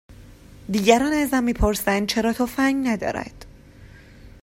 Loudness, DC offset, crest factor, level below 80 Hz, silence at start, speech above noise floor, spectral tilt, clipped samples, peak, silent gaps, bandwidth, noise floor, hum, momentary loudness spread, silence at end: -21 LUFS; under 0.1%; 22 dB; -38 dBFS; 0.1 s; 25 dB; -4.5 dB/octave; under 0.1%; -2 dBFS; none; 16 kHz; -46 dBFS; none; 11 LU; 0.15 s